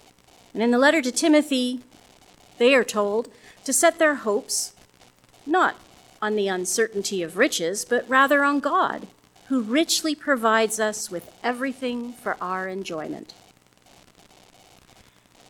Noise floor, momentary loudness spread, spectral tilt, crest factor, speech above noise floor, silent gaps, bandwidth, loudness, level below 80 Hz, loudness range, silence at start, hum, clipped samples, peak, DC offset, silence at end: -56 dBFS; 14 LU; -2.5 dB/octave; 20 dB; 33 dB; none; 18 kHz; -22 LUFS; -68 dBFS; 9 LU; 0.55 s; none; under 0.1%; -4 dBFS; under 0.1%; 2.25 s